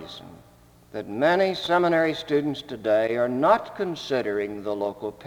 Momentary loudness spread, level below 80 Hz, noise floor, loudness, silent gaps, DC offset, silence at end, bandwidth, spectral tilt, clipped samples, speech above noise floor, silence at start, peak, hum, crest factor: 12 LU; -60 dBFS; -54 dBFS; -24 LUFS; none; under 0.1%; 0 s; 19 kHz; -6 dB/octave; under 0.1%; 30 dB; 0 s; -6 dBFS; none; 20 dB